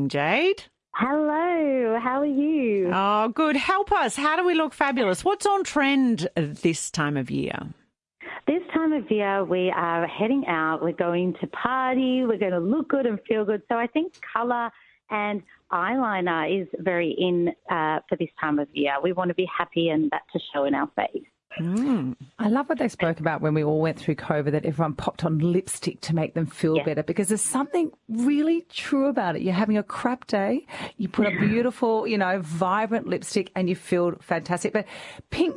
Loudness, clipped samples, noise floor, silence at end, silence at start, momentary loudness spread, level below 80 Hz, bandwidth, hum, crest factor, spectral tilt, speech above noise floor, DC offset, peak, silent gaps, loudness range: -25 LUFS; under 0.1%; -48 dBFS; 0 s; 0 s; 7 LU; -60 dBFS; 11.5 kHz; none; 18 dB; -5.5 dB/octave; 24 dB; under 0.1%; -6 dBFS; none; 4 LU